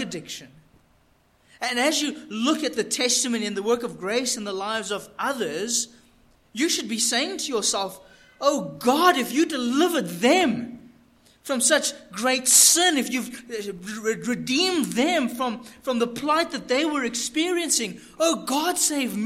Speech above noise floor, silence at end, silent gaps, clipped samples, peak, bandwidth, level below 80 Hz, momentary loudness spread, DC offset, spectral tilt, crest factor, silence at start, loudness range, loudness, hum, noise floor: 38 dB; 0 s; none; under 0.1%; -2 dBFS; 16.5 kHz; -64 dBFS; 12 LU; under 0.1%; -1.5 dB/octave; 24 dB; 0 s; 6 LU; -23 LUFS; none; -61 dBFS